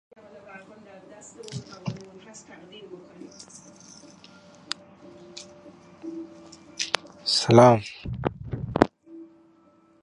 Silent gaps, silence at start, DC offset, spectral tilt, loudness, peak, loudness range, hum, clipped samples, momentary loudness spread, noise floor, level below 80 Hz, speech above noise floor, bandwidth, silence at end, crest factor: none; 0.35 s; under 0.1%; -5 dB/octave; -23 LUFS; 0 dBFS; 19 LU; none; under 0.1%; 29 LU; -59 dBFS; -52 dBFS; 36 dB; 11.5 kHz; 0.8 s; 28 dB